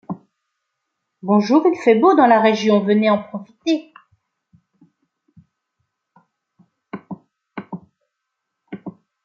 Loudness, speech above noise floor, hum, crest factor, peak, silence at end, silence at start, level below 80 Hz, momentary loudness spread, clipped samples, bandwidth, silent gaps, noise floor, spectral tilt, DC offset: -16 LUFS; 63 dB; none; 20 dB; -2 dBFS; 0.35 s; 0.1 s; -70 dBFS; 24 LU; under 0.1%; 7.4 kHz; none; -78 dBFS; -6.5 dB/octave; under 0.1%